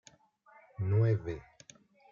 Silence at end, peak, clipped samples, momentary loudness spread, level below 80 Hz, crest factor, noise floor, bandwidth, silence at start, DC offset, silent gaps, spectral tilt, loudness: 0.7 s; -20 dBFS; under 0.1%; 17 LU; -62 dBFS; 16 dB; -63 dBFS; 7.2 kHz; 0.8 s; under 0.1%; none; -8.5 dB/octave; -32 LUFS